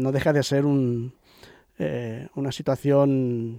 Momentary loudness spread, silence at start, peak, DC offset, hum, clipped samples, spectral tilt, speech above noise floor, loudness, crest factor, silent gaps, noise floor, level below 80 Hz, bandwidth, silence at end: 11 LU; 0 s; -10 dBFS; under 0.1%; none; under 0.1%; -7 dB/octave; 29 dB; -24 LUFS; 14 dB; none; -52 dBFS; -56 dBFS; 15.5 kHz; 0 s